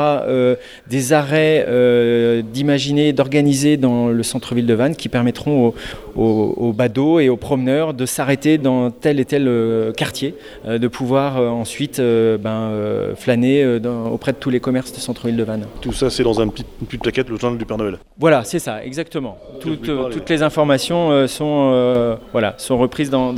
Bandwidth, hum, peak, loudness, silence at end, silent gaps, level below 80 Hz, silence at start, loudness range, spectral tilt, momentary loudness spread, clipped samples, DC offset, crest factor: 15.5 kHz; none; 0 dBFS; -17 LUFS; 0 s; none; -42 dBFS; 0 s; 5 LU; -6 dB/octave; 9 LU; under 0.1%; under 0.1%; 16 dB